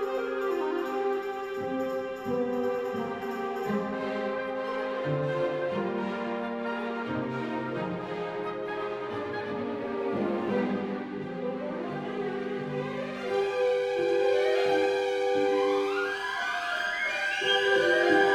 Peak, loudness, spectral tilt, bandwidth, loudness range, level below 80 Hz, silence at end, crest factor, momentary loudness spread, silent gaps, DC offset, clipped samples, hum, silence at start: -10 dBFS; -29 LUFS; -5 dB/octave; 13 kHz; 6 LU; -68 dBFS; 0 s; 18 dB; 9 LU; none; under 0.1%; under 0.1%; none; 0 s